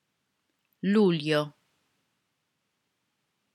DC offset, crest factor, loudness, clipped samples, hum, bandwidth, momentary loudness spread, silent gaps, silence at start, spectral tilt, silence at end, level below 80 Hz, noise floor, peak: under 0.1%; 20 dB; -26 LUFS; under 0.1%; none; 13.5 kHz; 11 LU; none; 0.85 s; -7 dB/octave; 2.05 s; under -90 dBFS; -79 dBFS; -12 dBFS